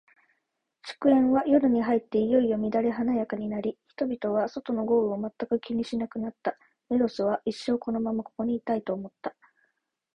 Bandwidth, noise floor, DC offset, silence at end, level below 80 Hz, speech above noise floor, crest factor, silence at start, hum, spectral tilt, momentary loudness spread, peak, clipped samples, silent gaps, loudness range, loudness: 9.4 kHz; -79 dBFS; under 0.1%; 0.85 s; -64 dBFS; 53 dB; 18 dB; 0.85 s; none; -7.5 dB/octave; 12 LU; -8 dBFS; under 0.1%; none; 5 LU; -27 LUFS